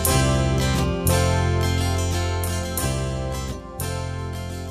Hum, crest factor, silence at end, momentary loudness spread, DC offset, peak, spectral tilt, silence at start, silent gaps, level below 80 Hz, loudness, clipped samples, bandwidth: none; 16 dB; 0 s; 10 LU; under 0.1%; -6 dBFS; -5 dB/octave; 0 s; none; -30 dBFS; -23 LUFS; under 0.1%; 15.5 kHz